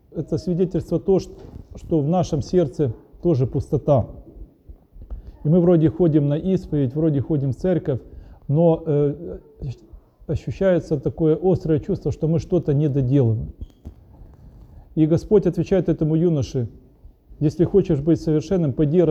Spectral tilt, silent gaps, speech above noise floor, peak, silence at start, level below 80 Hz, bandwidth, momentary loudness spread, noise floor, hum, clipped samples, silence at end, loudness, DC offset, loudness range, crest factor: -9.5 dB/octave; none; 29 dB; -6 dBFS; 0.15 s; -42 dBFS; 8.2 kHz; 16 LU; -48 dBFS; none; under 0.1%; 0 s; -21 LUFS; under 0.1%; 3 LU; 16 dB